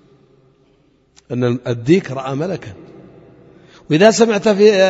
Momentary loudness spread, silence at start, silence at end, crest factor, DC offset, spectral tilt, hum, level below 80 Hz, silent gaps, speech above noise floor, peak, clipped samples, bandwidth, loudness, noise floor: 14 LU; 1.3 s; 0 s; 16 dB; under 0.1%; -5.5 dB/octave; none; -56 dBFS; none; 42 dB; 0 dBFS; under 0.1%; 8 kHz; -15 LUFS; -55 dBFS